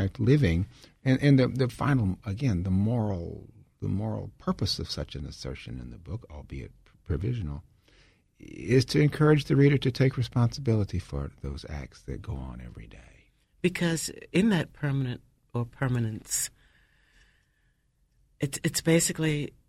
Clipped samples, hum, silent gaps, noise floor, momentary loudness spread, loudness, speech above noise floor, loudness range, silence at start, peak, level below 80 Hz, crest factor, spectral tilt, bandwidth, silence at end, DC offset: under 0.1%; none; none; -69 dBFS; 18 LU; -27 LUFS; 42 dB; 9 LU; 0 s; -8 dBFS; -46 dBFS; 20 dB; -6 dB/octave; 15.5 kHz; 0.2 s; under 0.1%